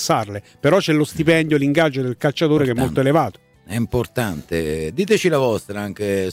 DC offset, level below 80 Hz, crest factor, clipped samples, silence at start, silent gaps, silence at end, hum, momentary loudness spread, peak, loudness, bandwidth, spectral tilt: under 0.1%; -44 dBFS; 14 dB; under 0.1%; 0 s; none; 0 s; none; 9 LU; -4 dBFS; -19 LUFS; 16 kHz; -5.5 dB/octave